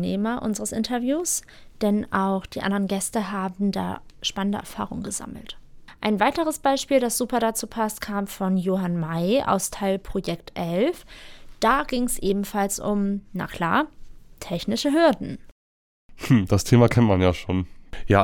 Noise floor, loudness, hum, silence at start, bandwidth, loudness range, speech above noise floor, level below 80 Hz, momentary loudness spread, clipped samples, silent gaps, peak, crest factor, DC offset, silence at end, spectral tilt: under -90 dBFS; -24 LUFS; none; 0 s; 18 kHz; 5 LU; over 67 dB; -46 dBFS; 12 LU; under 0.1%; 15.52-16.09 s; -4 dBFS; 20 dB; under 0.1%; 0 s; -5 dB/octave